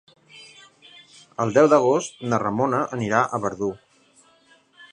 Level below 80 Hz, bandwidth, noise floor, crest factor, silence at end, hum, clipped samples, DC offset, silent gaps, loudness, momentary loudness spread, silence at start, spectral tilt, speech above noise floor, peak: -62 dBFS; 10.5 kHz; -57 dBFS; 22 dB; 0.1 s; none; under 0.1%; under 0.1%; none; -21 LUFS; 15 LU; 0.35 s; -6 dB/octave; 37 dB; -2 dBFS